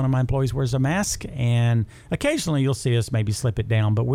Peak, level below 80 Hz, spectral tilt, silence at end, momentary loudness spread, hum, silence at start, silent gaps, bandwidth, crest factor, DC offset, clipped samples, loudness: -10 dBFS; -42 dBFS; -6 dB/octave; 0 s; 4 LU; none; 0 s; none; 15 kHz; 10 dB; under 0.1%; under 0.1%; -23 LUFS